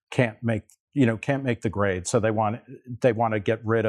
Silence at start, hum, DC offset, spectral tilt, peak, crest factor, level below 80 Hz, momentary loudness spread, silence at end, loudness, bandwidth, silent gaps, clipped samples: 0.1 s; none; under 0.1%; -6.5 dB/octave; -4 dBFS; 20 dB; -64 dBFS; 8 LU; 0 s; -25 LUFS; 11.5 kHz; 0.80-0.87 s; under 0.1%